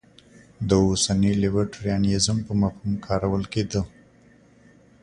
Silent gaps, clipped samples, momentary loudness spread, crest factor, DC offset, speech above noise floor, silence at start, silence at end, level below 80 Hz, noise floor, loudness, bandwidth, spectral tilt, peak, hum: none; under 0.1%; 8 LU; 18 dB; under 0.1%; 32 dB; 0.6 s; 1.15 s; -42 dBFS; -54 dBFS; -23 LUFS; 10.5 kHz; -5.5 dB/octave; -6 dBFS; none